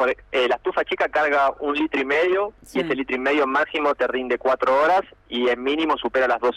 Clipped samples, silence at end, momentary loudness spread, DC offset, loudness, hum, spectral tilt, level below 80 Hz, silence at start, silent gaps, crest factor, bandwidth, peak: under 0.1%; 0 s; 5 LU; under 0.1%; -21 LUFS; none; -4.5 dB/octave; -54 dBFS; 0 s; none; 10 dB; 13 kHz; -12 dBFS